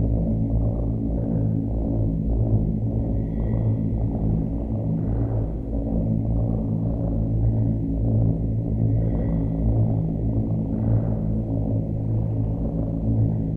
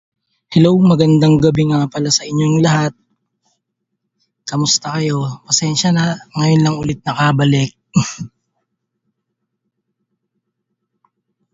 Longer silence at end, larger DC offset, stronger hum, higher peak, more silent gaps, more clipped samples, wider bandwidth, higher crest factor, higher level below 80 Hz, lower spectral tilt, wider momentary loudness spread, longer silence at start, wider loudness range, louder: second, 0 s vs 3.25 s; neither; neither; second, -10 dBFS vs 0 dBFS; neither; neither; second, 2.2 kHz vs 7.8 kHz; about the same, 12 dB vs 16 dB; first, -28 dBFS vs -50 dBFS; first, -13.5 dB/octave vs -5 dB/octave; second, 3 LU vs 10 LU; second, 0 s vs 0.5 s; second, 2 LU vs 6 LU; second, -24 LUFS vs -14 LUFS